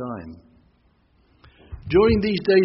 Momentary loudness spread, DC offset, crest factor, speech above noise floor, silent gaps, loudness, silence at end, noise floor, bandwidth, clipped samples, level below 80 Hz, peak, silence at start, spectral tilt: 24 LU; under 0.1%; 16 dB; 42 dB; none; -20 LUFS; 0 s; -61 dBFS; 5.8 kHz; under 0.1%; -40 dBFS; -6 dBFS; 0 s; -5.5 dB/octave